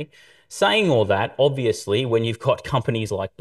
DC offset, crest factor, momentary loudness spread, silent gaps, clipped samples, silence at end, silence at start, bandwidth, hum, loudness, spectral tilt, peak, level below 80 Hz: under 0.1%; 16 dB; 7 LU; none; under 0.1%; 0.15 s; 0 s; 12.5 kHz; none; -21 LUFS; -5.5 dB/octave; -6 dBFS; -54 dBFS